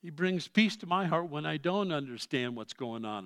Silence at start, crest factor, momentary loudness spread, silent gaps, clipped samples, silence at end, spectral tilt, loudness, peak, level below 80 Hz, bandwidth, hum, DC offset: 0.05 s; 22 dB; 10 LU; none; under 0.1%; 0 s; -5.5 dB/octave; -32 LUFS; -10 dBFS; -84 dBFS; 12 kHz; none; under 0.1%